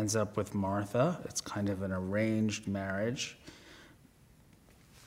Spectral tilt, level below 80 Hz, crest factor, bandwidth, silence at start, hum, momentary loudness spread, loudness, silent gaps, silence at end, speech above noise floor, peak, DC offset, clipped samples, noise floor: -5 dB/octave; -66 dBFS; 18 dB; 16 kHz; 0 s; none; 14 LU; -34 LUFS; none; 0 s; 28 dB; -16 dBFS; under 0.1%; under 0.1%; -61 dBFS